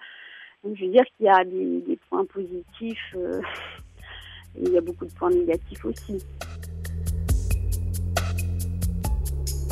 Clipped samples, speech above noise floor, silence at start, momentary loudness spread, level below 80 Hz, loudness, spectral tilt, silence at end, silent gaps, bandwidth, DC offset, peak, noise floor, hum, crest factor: under 0.1%; 21 dB; 0 s; 19 LU; -34 dBFS; -26 LUFS; -6 dB/octave; 0 s; none; 15.5 kHz; under 0.1%; -4 dBFS; -46 dBFS; none; 22 dB